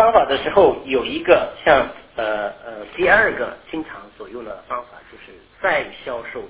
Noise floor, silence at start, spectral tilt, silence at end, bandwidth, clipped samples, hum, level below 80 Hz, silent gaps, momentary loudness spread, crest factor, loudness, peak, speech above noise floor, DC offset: -44 dBFS; 0 s; -8 dB/octave; 0 s; 4 kHz; under 0.1%; none; -48 dBFS; none; 18 LU; 18 dB; -18 LUFS; 0 dBFS; 24 dB; under 0.1%